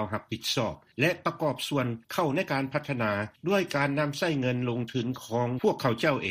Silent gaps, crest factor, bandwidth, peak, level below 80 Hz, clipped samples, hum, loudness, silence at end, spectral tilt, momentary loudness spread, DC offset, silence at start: none; 18 dB; 15.5 kHz; -12 dBFS; -64 dBFS; under 0.1%; none; -29 LUFS; 0 s; -5.5 dB/octave; 5 LU; under 0.1%; 0 s